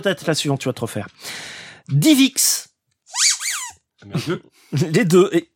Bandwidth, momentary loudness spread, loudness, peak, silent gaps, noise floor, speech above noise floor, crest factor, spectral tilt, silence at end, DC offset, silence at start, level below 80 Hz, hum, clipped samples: 17 kHz; 17 LU; -18 LUFS; -2 dBFS; none; -43 dBFS; 24 dB; 18 dB; -4 dB/octave; 0.1 s; under 0.1%; 0 s; -66 dBFS; none; under 0.1%